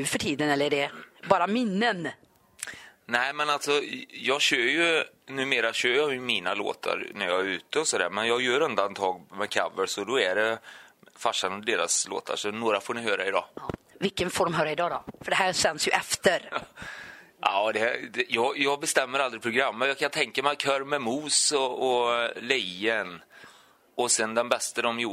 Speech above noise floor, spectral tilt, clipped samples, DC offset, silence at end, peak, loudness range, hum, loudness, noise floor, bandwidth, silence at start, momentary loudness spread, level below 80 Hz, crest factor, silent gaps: 29 dB; -2 dB/octave; under 0.1%; under 0.1%; 0 s; -6 dBFS; 3 LU; none; -26 LUFS; -56 dBFS; 16 kHz; 0 s; 10 LU; -66 dBFS; 22 dB; none